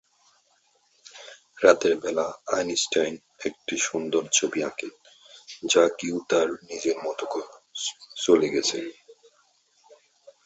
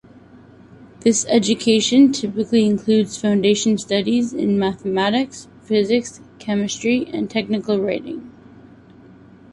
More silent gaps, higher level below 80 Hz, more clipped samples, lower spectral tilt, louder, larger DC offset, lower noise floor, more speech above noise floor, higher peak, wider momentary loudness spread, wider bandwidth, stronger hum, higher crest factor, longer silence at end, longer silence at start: neither; second, -68 dBFS vs -56 dBFS; neither; second, -2 dB/octave vs -4.5 dB/octave; second, -25 LUFS vs -18 LUFS; neither; first, -66 dBFS vs -45 dBFS; first, 42 dB vs 27 dB; about the same, -4 dBFS vs -2 dBFS; first, 17 LU vs 9 LU; second, 8.2 kHz vs 11.5 kHz; neither; first, 24 dB vs 18 dB; about the same, 1.3 s vs 1.25 s; first, 1.15 s vs 0.8 s